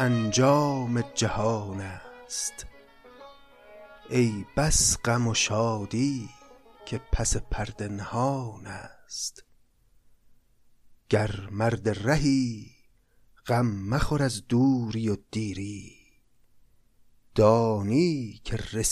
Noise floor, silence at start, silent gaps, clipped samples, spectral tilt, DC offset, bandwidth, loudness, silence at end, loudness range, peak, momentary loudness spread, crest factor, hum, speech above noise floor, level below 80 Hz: -61 dBFS; 0 s; none; under 0.1%; -4.5 dB/octave; under 0.1%; 14.5 kHz; -27 LUFS; 0 s; 7 LU; -8 dBFS; 16 LU; 20 dB; none; 35 dB; -42 dBFS